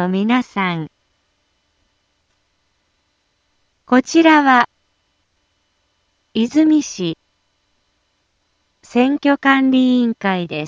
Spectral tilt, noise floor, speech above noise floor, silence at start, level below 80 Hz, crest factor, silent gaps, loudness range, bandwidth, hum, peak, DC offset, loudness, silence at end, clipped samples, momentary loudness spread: -5 dB/octave; -66 dBFS; 51 dB; 0 s; -64 dBFS; 18 dB; none; 8 LU; 7.6 kHz; none; 0 dBFS; under 0.1%; -15 LUFS; 0 s; under 0.1%; 13 LU